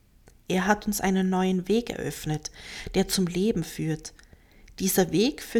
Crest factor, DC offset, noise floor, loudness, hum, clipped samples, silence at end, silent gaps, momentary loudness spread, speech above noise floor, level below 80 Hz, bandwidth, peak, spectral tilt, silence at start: 18 dB; under 0.1%; -52 dBFS; -26 LUFS; none; under 0.1%; 0 s; none; 9 LU; 27 dB; -48 dBFS; 18 kHz; -8 dBFS; -5 dB/octave; 0.5 s